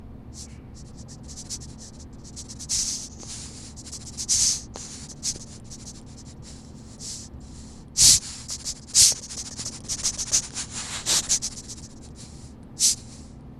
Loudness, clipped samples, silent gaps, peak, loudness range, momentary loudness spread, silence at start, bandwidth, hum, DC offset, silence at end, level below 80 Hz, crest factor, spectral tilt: -22 LUFS; under 0.1%; none; 0 dBFS; 12 LU; 26 LU; 0 s; 16 kHz; none; under 0.1%; 0 s; -46 dBFS; 28 dB; 0 dB/octave